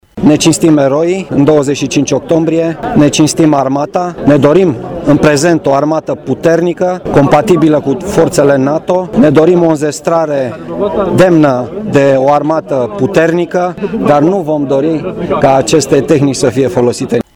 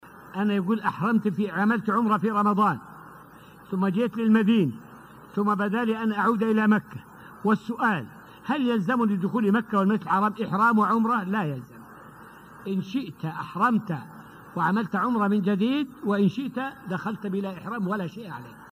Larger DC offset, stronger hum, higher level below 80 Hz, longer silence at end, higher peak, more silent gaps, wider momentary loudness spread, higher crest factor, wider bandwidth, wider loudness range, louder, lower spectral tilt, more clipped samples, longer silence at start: first, 0.2% vs under 0.1%; neither; first, -38 dBFS vs -66 dBFS; about the same, 0.15 s vs 0.05 s; first, 0 dBFS vs -8 dBFS; neither; second, 7 LU vs 15 LU; second, 10 dB vs 16 dB; first, 17 kHz vs 15 kHz; second, 1 LU vs 4 LU; first, -10 LUFS vs -25 LUFS; second, -6 dB/octave vs -8 dB/octave; first, 0.3% vs under 0.1%; about the same, 0.15 s vs 0.05 s